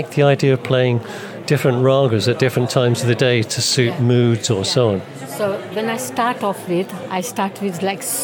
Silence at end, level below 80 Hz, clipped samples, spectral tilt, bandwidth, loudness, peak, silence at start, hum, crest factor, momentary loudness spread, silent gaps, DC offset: 0 s; -62 dBFS; under 0.1%; -5 dB/octave; 17.5 kHz; -18 LUFS; 0 dBFS; 0 s; none; 16 dB; 8 LU; none; under 0.1%